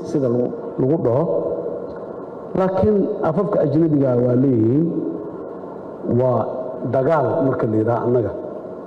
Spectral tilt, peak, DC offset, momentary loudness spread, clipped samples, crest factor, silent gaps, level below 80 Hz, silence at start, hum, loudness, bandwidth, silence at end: -10.5 dB/octave; -8 dBFS; under 0.1%; 14 LU; under 0.1%; 10 dB; none; -54 dBFS; 0 s; none; -19 LUFS; 7.4 kHz; 0 s